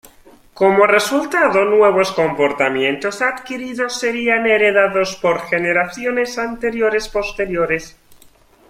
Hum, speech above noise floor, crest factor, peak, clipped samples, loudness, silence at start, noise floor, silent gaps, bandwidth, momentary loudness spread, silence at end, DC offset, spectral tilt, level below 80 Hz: none; 33 dB; 16 dB; -2 dBFS; under 0.1%; -16 LUFS; 0.55 s; -49 dBFS; none; 16 kHz; 9 LU; 0.8 s; under 0.1%; -4 dB/octave; -48 dBFS